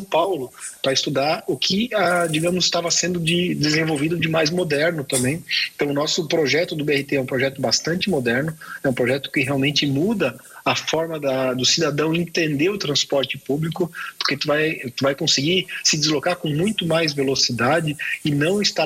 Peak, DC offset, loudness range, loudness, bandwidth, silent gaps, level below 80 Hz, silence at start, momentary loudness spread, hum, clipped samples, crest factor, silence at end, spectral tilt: -6 dBFS; under 0.1%; 2 LU; -20 LUFS; 16.5 kHz; none; -56 dBFS; 0 s; 6 LU; none; under 0.1%; 14 dB; 0 s; -3.5 dB/octave